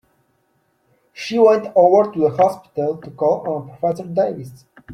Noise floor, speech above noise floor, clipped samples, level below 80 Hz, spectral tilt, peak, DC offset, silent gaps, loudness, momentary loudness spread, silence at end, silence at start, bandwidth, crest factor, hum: -64 dBFS; 47 dB; under 0.1%; -64 dBFS; -7 dB/octave; -2 dBFS; under 0.1%; none; -18 LUFS; 12 LU; 0 s; 1.15 s; 13.5 kHz; 16 dB; none